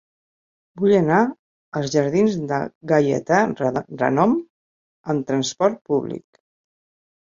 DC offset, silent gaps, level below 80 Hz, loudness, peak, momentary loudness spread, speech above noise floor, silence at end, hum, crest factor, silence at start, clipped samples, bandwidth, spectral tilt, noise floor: under 0.1%; 1.39-1.72 s, 2.75-2.81 s, 4.50-5.04 s; -60 dBFS; -20 LUFS; -2 dBFS; 8 LU; over 70 dB; 1.05 s; none; 18 dB; 0.75 s; under 0.1%; 7.6 kHz; -6 dB/octave; under -90 dBFS